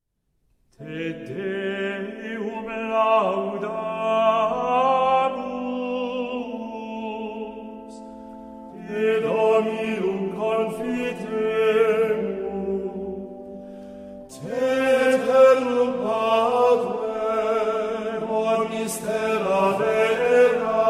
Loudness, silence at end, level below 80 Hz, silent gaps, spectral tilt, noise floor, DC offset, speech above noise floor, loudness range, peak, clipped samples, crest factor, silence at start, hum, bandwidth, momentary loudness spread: -23 LUFS; 0 s; -58 dBFS; none; -5 dB/octave; -70 dBFS; under 0.1%; 41 dB; 7 LU; -6 dBFS; under 0.1%; 18 dB; 0.8 s; none; 15 kHz; 19 LU